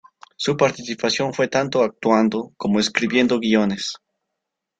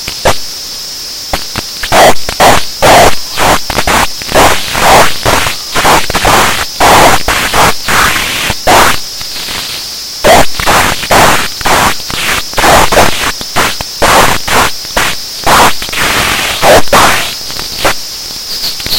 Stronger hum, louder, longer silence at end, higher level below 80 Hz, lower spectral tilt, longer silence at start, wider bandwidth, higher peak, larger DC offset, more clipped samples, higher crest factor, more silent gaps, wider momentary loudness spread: neither; second, -20 LUFS vs -8 LUFS; first, 0.85 s vs 0 s; second, -58 dBFS vs -24 dBFS; first, -4.5 dB/octave vs -2 dB/octave; first, 0.4 s vs 0 s; second, 9.2 kHz vs over 20 kHz; about the same, -2 dBFS vs 0 dBFS; neither; second, under 0.1% vs 3%; first, 18 dB vs 8 dB; neither; second, 8 LU vs 11 LU